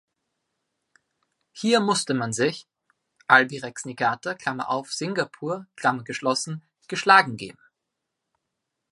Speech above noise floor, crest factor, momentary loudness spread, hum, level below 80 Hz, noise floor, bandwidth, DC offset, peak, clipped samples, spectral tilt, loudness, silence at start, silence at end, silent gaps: 59 dB; 24 dB; 16 LU; none; -72 dBFS; -82 dBFS; 11.5 kHz; under 0.1%; -2 dBFS; under 0.1%; -3.5 dB/octave; -23 LUFS; 1.55 s; 1.4 s; none